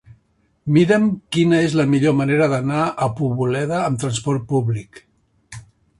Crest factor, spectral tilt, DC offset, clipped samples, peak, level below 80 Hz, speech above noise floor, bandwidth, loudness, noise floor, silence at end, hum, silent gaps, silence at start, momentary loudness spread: 16 dB; -6.5 dB/octave; under 0.1%; under 0.1%; -2 dBFS; -52 dBFS; 44 dB; 11.5 kHz; -18 LUFS; -62 dBFS; 0.4 s; none; none; 0.65 s; 10 LU